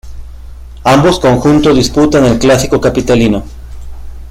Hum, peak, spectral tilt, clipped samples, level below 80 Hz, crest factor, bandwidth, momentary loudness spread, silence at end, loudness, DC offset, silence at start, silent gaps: none; 0 dBFS; -5.5 dB/octave; under 0.1%; -26 dBFS; 10 dB; 16 kHz; 6 LU; 0 s; -9 LUFS; under 0.1%; 0.05 s; none